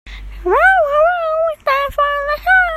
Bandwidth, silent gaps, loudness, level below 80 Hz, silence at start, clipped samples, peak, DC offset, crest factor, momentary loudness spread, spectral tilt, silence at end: 15 kHz; none; -14 LUFS; -36 dBFS; 0.05 s; under 0.1%; 0 dBFS; under 0.1%; 14 dB; 7 LU; -4.5 dB/octave; 0 s